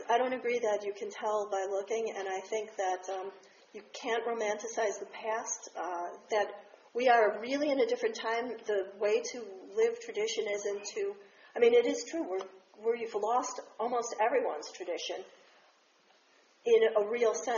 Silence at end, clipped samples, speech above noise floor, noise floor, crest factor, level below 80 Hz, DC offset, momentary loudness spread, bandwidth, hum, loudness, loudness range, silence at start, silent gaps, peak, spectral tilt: 0 s; under 0.1%; 34 dB; -66 dBFS; 20 dB; -86 dBFS; under 0.1%; 13 LU; 7.2 kHz; none; -32 LUFS; 5 LU; 0 s; none; -14 dBFS; -0.5 dB/octave